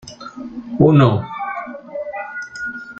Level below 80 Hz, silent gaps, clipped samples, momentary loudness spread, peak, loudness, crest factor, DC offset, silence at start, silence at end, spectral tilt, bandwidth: -50 dBFS; none; under 0.1%; 20 LU; -2 dBFS; -18 LUFS; 16 dB; under 0.1%; 0.05 s; 0.05 s; -8 dB/octave; 8 kHz